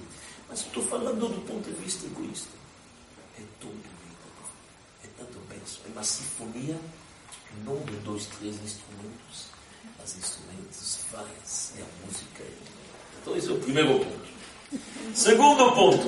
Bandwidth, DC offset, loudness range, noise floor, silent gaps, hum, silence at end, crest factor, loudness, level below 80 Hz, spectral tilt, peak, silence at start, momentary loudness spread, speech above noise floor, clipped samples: 11.5 kHz; under 0.1%; 12 LU; -53 dBFS; none; none; 0 s; 24 dB; -27 LUFS; -62 dBFS; -3 dB/octave; -6 dBFS; 0 s; 23 LU; 25 dB; under 0.1%